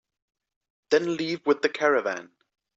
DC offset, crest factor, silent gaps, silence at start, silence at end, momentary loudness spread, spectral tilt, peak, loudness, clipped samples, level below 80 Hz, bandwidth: under 0.1%; 20 dB; none; 0.9 s; 0.5 s; 7 LU; -4.5 dB/octave; -8 dBFS; -25 LUFS; under 0.1%; -74 dBFS; 7.8 kHz